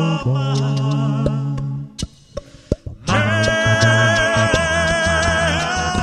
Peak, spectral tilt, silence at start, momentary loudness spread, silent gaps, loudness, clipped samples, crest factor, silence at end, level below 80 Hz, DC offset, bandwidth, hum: 0 dBFS; -4.5 dB/octave; 0 s; 14 LU; none; -17 LUFS; under 0.1%; 16 dB; 0 s; -34 dBFS; under 0.1%; 11.5 kHz; none